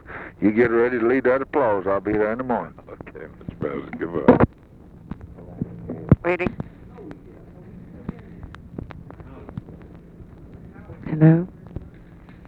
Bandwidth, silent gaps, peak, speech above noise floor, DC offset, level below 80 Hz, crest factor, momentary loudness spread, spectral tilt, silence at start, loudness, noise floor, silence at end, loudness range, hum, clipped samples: 4.4 kHz; none; 0 dBFS; 26 dB; under 0.1%; -44 dBFS; 24 dB; 25 LU; -10.5 dB/octave; 0.1 s; -21 LUFS; -46 dBFS; 0.15 s; 18 LU; none; under 0.1%